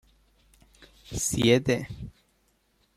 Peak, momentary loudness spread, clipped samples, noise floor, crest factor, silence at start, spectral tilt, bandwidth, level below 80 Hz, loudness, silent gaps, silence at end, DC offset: -8 dBFS; 20 LU; under 0.1%; -69 dBFS; 22 dB; 1.1 s; -4.5 dB/octave; 15 kHz; -52 dBFS; -25 LUFS; none; 0.85 s; under 0.1%